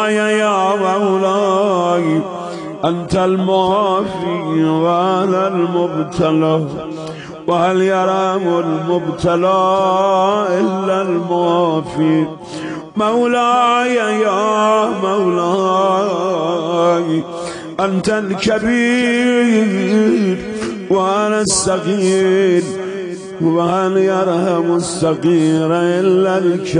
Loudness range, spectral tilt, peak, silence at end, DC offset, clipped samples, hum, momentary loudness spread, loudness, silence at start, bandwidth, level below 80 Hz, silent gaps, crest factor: 2 LU; -5.5 dB/octave; -2 dBFS; 0 s; under 0.1%; under 0.1%; none; 7 LU; -15 LUFS; 0 s; 10.5 kHz; -50 dBFS; none; 12 dB